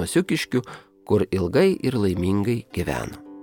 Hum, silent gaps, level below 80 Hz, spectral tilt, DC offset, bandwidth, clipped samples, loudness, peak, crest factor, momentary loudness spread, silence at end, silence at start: none; none; -46 dBFS; -6 dB/octave; under 0.1%; 19 kHz; under 0.1%; -23 LUFS; -8 dBFS; 16 dB; 11 LU; 0 s; 0 s